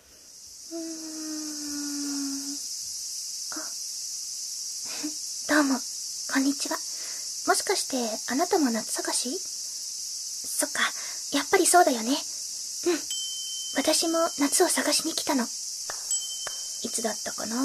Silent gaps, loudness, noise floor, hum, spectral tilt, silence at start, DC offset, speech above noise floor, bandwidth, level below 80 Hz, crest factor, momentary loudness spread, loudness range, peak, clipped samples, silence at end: none; -27 LUFS; -49 dBFS; none; -0.5 dB/octave; 0.1 s; under 0.1%; 23 dB; 14 kHz; -72 dBFS; 22 dB; 9 LU; 6 LU; -6 dBFS; under 0.1%; 0 s